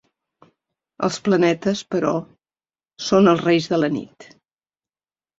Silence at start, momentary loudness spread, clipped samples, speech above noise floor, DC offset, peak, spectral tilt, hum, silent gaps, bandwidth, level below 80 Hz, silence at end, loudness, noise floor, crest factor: 1 s; 12 LU; under 0.1%; over 71 dB; under 0.1%; -4 dBFS; -5.5 dB/octave; none; none; 8 kHz; -62 dBFS; 1.15 s; -20 LUFS; under -90 dBFS; 18 dB